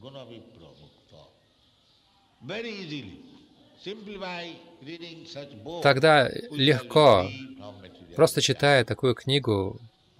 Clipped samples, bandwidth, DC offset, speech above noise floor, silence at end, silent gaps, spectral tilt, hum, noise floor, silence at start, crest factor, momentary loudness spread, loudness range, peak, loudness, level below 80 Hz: under 0.1%; 16 kHz; under 0.1%; 38 dB; 0.35 s; none; -4.5 dB/octave; none; -63 dBFS; 0.05 s; 20 dB; 24 LU; 19 LU; -6 dBFS; -23 LUFS; -62 dBFS